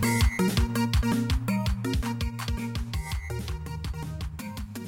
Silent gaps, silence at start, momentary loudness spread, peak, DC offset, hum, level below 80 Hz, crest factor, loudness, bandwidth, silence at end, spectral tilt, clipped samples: none; 0 s; 11 LU; -14 dBFS; under 0.1%; none; -32 dBFS; 14 dB; -29 LUFS; 17 kHz; 0 s; -5.5 dB/octave; under 0.1%